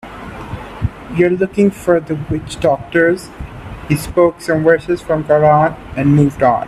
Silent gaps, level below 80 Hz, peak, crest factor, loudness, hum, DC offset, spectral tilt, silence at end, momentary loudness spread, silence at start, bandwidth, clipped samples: none; -36 dBFS; 0 dBFS; 14 dB; -15 LUFS; none; under 0.1%; -7.5 dB/octave; 0 s; 17 LU; 0.05 s; 13.5 kHz; under 0.1%